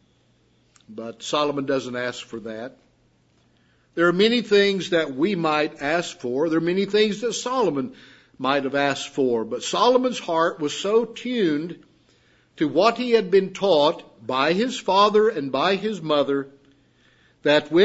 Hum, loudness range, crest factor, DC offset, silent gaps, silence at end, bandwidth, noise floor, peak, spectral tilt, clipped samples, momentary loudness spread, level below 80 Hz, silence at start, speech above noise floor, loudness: none; 5 LU; 20 dB; under 0.1%; none; 0 s; 8 kHz; -62 dBFS; -4 dBFS; -4.5 dB/octave; under 0.1%; 15 LU; -66 dBFS; 0.9 s; 40 dB; -22 LUFS